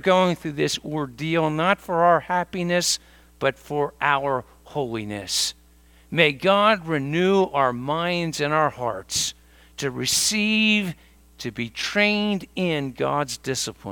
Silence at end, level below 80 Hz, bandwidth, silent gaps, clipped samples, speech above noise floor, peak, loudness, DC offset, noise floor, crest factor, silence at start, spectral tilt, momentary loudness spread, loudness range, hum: 0 s; -54 dBFS; 19 kHz; none; under 0.1%; 30 dB; 0 dBFS; -22 LUFS; under 0.1%; -53 dBFS; 22 dB; 0.05 s; -3.5 dB/octave; 11 LU; 3 LU; none